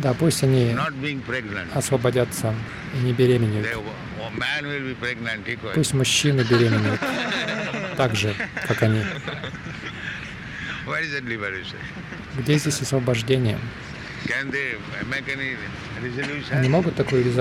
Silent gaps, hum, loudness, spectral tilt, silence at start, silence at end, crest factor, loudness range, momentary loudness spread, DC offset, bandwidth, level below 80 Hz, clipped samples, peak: none; none; -24 LUFS; -5 dB/octave; 0 s; 0 s; 18 dB; 5 LU; 13 LU; under 0.1%; 15.5 kHz; -48 dBFS; under 0.1%; -6 dBFS